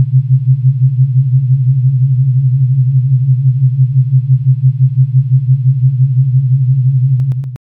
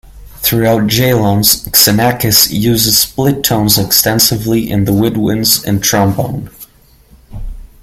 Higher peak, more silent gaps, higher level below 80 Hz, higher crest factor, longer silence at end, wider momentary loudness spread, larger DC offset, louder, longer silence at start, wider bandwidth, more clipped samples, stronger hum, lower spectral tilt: about the same, -2 dBFS vs 0 dBFS; neither; second, -48 dBFS vs -34 dBFS; about the same, 8 dB vs 12 dB; about the same, 0.15 s vs 0.15 s; second, 1 LU vs 9 LU; neither; about the same, -11 LUFS vs -10 LUFS; about the same, 0 s vs 0.05 s; second, 0.3 kHz vs over 20 kHz; second, under 0.1% vs 0.2%; neither; first, -13 dB/octave vs -3.5 dB/octave